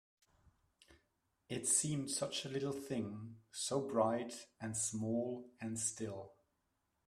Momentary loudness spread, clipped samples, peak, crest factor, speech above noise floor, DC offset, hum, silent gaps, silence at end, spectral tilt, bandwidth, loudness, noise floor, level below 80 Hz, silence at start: 14 LU; under 0.1%; -18 dBFS; 24 dB; 44 dB; under 0.1%; none; none; 0.75 s; -3.5 dB/octave; 14 kHz; -39 LUFS; -84 dBFS; -76 dBFS; 0.9 s